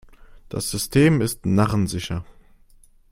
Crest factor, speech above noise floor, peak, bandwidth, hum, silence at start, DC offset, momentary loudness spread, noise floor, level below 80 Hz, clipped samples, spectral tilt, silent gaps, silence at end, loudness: 18 dB; 32 dB; -4 dBFS; 16.5 kHz; none; 0.55 s; under 0.1%; 13 LU; -52 dBFS; -44 dBFS; under 0.1%; -5.5 dB/octave; none; 0.9 s; -21 LUFS